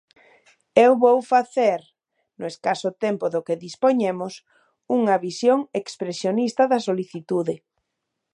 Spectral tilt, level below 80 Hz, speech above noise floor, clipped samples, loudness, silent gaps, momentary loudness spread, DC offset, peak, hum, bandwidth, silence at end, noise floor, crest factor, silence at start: -5.5 dB/octave; -76 dBFS; 59 dB; under 0.1%; -22 LUFS; none; 13 LU; under 0.1%; 0 dBFS; none; 10.5 kHz; 0.75 s; -80 dBFS; 22 dB; 0.75 s